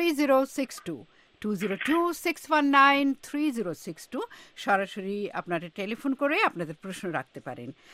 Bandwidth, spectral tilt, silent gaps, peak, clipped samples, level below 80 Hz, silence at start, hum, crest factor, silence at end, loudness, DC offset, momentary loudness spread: 16 kHz; -4.5 dB/octave; none; -6 dBFS; under 0.1%; -70 dBFS; 0 s; none; 20 dB; 0.2 s; -27 LUFS; under 0.1%; 17 LU